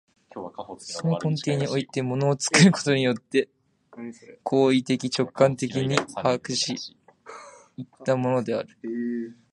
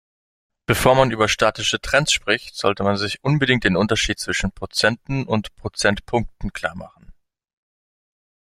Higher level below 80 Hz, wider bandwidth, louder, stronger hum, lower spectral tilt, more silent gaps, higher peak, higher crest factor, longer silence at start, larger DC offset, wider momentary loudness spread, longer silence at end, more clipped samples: second, -66 dBFS vs -40 dBFS; second, 11.5 kHz vs 16 kHz; second, -24 LUFS vs -20 LUFS; neither; about the same, -5 dB/octave vs -4 dB/octave; neither; about the same, -4 dBFS vs -2 dBFS; about the same, 22 dB vs 20 dB; second, 0.35 s vs 0.7 s; neither; first, 20 LU vs 11 LU; second, 0.2 s vs 1.45 s; neither